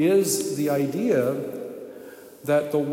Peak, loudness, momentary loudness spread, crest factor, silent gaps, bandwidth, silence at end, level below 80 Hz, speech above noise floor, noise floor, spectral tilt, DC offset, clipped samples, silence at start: -10 dBFS; -24 LUFS; 18 LU; 14 dB; none; 16.5 kHz; 0 s; -76 dBFS; 21 dB; -43 dBFS; -5 dB/octave; under 0.1%; under 0.1%; 0 s